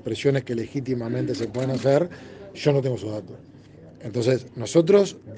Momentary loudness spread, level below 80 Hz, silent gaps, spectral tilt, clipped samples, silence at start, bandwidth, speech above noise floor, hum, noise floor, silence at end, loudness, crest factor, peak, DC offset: 15 LU; -60 dBFS; none; -6.5 dB/octave; under 0.1%; 0.05 s; 9.6 kHz; 23 dB; none; -46 dBFS; 0 s; -24 LUFS; 18 dB; -6 dBFS; under 0.1%